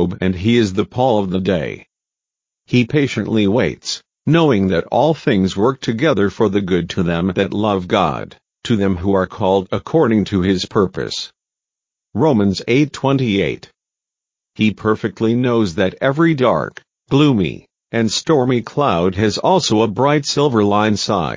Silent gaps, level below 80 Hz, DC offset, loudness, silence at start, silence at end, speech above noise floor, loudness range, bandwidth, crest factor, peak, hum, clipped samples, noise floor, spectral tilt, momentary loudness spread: none; -42 dBFS; under 0.1%; -16 LUFS; 0 s; 0 s; 70 dB; 3 LU; 7.6 kHz; 16 dB; 0 dBFS; none; under 0.1%; -86 dBFS; -6 dB/octave; 7 LU